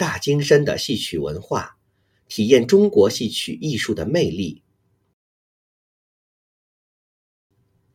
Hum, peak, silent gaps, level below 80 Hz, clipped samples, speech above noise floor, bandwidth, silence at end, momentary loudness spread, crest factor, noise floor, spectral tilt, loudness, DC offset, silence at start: none; -2 dBFS; none; -52 dBFS; under 0.1%; 47 dB; 16 kHz; 3.4 s; 12 LU; 20 dB; -66 dBFS; -5 dB/octave; -19 LUFS; under 0.1%; 0 s